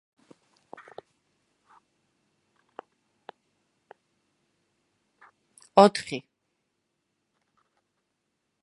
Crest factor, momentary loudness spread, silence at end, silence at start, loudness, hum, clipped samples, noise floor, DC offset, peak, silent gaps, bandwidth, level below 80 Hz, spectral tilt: 30 dB; 28 LU; 2.45 s; 5.75 s; -22 LUFS; none; under 0.1%; -79 dBFS; under 0.1%; -2 dBFS; none; 11 kHz; -76 dBFS; -5.5 dB/octave